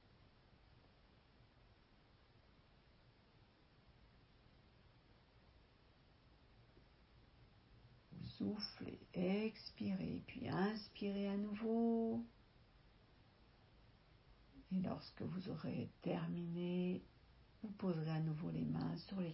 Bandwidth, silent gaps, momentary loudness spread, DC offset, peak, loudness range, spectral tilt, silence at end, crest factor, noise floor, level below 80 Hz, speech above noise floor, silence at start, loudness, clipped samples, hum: 5.6 kHz; none; 9 LU; under 0.1%; -28 dBFS; 9 LU; -6.5 dB/octave; 0 s; 18 dB; -70 dBFS; -70 dBFS; 27 dB; 0.75 s; -44 LUFS; under 0.1%; none